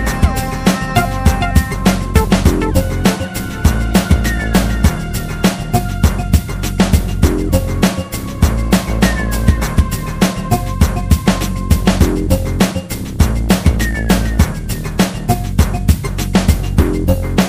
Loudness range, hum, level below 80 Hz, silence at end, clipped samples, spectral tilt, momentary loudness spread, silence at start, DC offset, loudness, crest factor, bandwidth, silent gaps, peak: 1 LU; none; -18 dBFS; 0 s; under 0.1%; -5.5 dB/octave; 4 LU; 0 s; 0.5%; -15 LUFS; 14 dB; 16 kHz; none; 0 dBFS